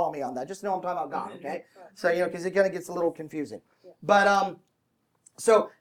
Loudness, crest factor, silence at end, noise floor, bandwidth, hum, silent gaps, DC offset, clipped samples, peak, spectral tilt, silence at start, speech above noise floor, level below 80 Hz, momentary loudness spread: -27 LUFS; 20 dB; 0.1 s; -73 dBFS; 16.5 kHz; none; none; under 0.1%; under 0.1%; -8 dBFS; -4.5 dB/octave; 0 s; 46 dB; -74 dBFS; 15 LU